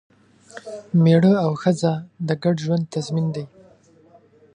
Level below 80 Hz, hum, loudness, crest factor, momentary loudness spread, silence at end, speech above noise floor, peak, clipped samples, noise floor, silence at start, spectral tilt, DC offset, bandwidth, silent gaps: -64 dBFS; none; -20 LUFS; 16 dB; 21 LU; 1.1 s; 33 dB; -4 dBFS; under 0.1%; -53 dBFS; 0.55 s; -7.5 dB/octave; under 0.1%; 9.8 kHz; none